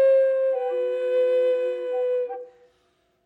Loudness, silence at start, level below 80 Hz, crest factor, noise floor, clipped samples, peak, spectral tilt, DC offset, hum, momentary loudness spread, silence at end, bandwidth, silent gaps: -23 LUFS; 0 s; -82 dBFS; 10 dB; -67 dBFS; under 0.1%; -12 dBFS; -4 dB/octave; under 0.1%; none; 8 LU; 0.75 s; 4.3 kHz; none